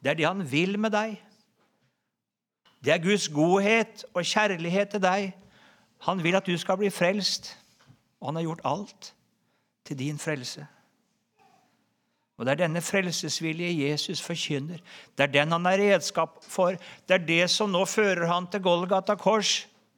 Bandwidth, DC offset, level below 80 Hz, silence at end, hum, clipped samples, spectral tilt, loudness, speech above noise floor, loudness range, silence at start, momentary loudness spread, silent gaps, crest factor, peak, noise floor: 19 kHz; under 0.1%; -76 dBFS; 0.35 s; none; under 0.1%; -4 dB/octave; -26 LUFS; 61 dB; 10 LU; 0 s; 12 LU; none; 22 dB; -6 dBFS; -87 dBFS